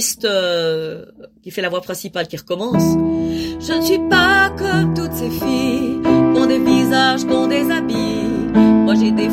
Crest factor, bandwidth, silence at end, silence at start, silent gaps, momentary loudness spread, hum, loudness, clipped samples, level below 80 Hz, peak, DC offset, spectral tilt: 16 dB; 16.5 kHz; 0 s; 0 s; none; 11 LU; none; -16 LUFS; under 0.1%; -42 dBFS; 0 dBFS; under 0.1%; -4.5 dB/octave